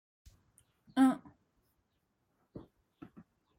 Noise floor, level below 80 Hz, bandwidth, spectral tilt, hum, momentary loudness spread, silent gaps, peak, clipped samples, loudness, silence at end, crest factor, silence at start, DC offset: -80 dBFS; -72 dBFS; 13 kHz; -5.5 dB/octave; none; 27 LU; none; -18 dBFS; under 0.1%; -31 LUFS; 1 s; 20 dB; 0.95 s; under 0.1%